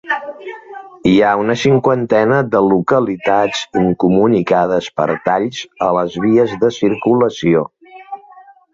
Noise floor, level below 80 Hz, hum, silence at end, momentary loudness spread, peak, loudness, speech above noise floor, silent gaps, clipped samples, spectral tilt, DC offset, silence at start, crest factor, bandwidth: -42 dBFS; -48 dBFS; none; 0.55 s; 16 LU; -2 dBFS; -14 LUFS; 29 dB; none; under 0.1%; -6.5 dB/octave; under 0.1%; 0.05 s; 14 dB; 7.8 kHz